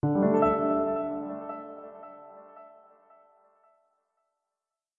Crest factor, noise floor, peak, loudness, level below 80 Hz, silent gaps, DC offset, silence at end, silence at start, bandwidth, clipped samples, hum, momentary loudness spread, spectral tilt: 20 dB; -90 dBFS; -12 dBFS; -27 LUFS; -60 dBFS; none; under 0.1%; 2.3 s; 0.05 s; 7.2 kHz; under 0.1%; none; 25 LU; -11 dB/octave